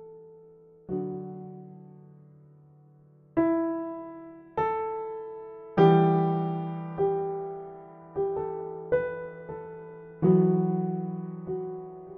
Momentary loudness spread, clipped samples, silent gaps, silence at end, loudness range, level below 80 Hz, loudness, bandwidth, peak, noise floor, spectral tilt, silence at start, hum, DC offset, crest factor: 21 LU; under 0.1%; none; 0 s; 7 LU; -64 dBFS; -28 LUFS; 4.3 kHz; -8 dBFS; -57 dBFS; -8 dB/octave; 0 s; none; under 0.1%; 22 dB